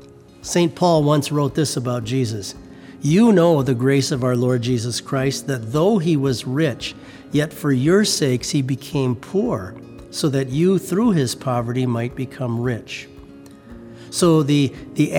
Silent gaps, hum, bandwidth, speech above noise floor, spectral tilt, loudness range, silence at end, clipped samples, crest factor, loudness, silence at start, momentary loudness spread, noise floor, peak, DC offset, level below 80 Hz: none; none; 18 kHz; 23 dB; -6 dB/octave; 4 LU; 0 s; under 0.1%; 16 dB; -19 LUFS; 0 s; 13 LU; -41 dBFS; -4 dBFS; under 0.1%; -50 dBFS